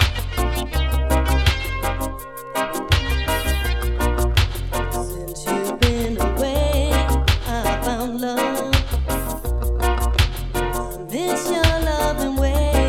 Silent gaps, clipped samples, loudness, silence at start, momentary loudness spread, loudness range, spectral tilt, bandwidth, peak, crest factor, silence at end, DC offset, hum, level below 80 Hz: none; under 0.1%; -21 LUFS; 0 s; 7 LU; 1 LU; -5 dB/octave; 17 kHz; -2 dBFS; 18 dB; 0 s; under 0.1%; none; -22 dBFS